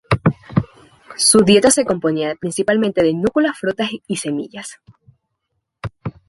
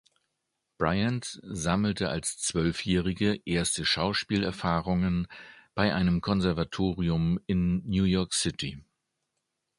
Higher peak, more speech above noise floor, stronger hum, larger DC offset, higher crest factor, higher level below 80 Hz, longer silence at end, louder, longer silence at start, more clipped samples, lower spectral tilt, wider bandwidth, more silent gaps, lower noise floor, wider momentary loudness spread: first, 0 dBFS vs -8 dBFS; about the same, 57 dB vs 54 dB; neither; neither; about the same, 18 dB vs 20 dB; about the same, -46 dBFS vs -46 dBFS; second, 0.2 s vs 0.95 s; first, -16 LUFS vs -28 LUFS; second, 0.1 s vs 0.8 s; neither; about the same, -4 dB/octave vs -5 dB/octave; about the same, 12 kHz vs 11.5 kHz; neither; second, -74 dBFS vs -82 dBFS; first, 21 LU vs 6 LU